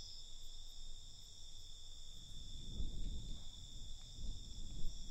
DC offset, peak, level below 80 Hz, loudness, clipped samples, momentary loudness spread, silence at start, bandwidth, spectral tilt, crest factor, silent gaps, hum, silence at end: under 0.1%; -28 dBFS; -48 dBFS; -53 LUFS; under 0.1%; 6 LU; 0 s; 8.8 kHz; -3.5 dB/octave; 16 dB; none; none; 0 s